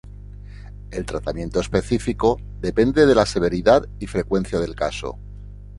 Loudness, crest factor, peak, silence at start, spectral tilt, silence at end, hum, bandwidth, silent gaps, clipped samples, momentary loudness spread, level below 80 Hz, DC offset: -21 LUFS; 20 dB; -2 dBFS; 0.05 s; -6 dB/octave; 0 s; 50 Hz at -35 dBFS; 11.5 kHz; none; under 0.1%; 24 LU; -36 dBFS; under 0.1%